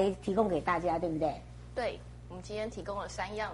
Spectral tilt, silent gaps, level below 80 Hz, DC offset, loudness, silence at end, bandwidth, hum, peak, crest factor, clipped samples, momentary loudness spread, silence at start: -6 dB/octave; none; -50 dBFS; under 0.1%; -34 LUFS; 0 s; 11.5 kHz; none; -14 dBFS; 20 dB; under 0.1%; 15 LU; 0 s